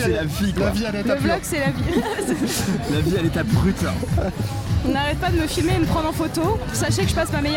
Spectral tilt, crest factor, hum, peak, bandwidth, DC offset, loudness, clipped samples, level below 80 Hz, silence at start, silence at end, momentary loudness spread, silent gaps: -5.5 dB/octave; 14 dB; none; -6 dBFS; 17 kHz; under 0.1%; -21 LUFS; under 0.1%; -32 dBFS; 0 s; 0 s; 3 LU; none